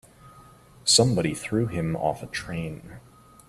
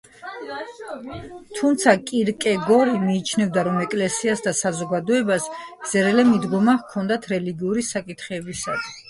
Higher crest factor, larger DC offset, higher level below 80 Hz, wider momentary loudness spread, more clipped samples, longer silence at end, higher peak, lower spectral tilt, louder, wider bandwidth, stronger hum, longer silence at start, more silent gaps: first, 24 dB vs 18 dB; neither; first, -52 dBFS vs -58 dBFS; about the same, 15 LU vs 16 LU; neither; first, 0.5 s vs 0.1 s; about the same, -4 dBFS vs -2 dBFS; about the same, -4 dB/octave vs -4.5 dB/octave; second, -24 LUFS vs -21 LUFS; first, 14.5 kHz vs 11.5 kHz; neither; about the same, 0.25 s vs 0.2 s; neither